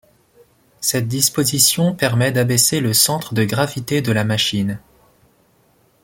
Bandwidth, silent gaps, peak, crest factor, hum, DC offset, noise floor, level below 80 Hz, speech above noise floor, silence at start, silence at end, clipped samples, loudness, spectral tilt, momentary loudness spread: 17 kHz; none; 0 dBFS; 18 dB; none; under 0.1%; -57 dBFS; -52 dBFS; 40 dB; 0.8 s; 1.25 s; under 0.1%; -16 LUFS; -3.5 dB/octave; 7 LU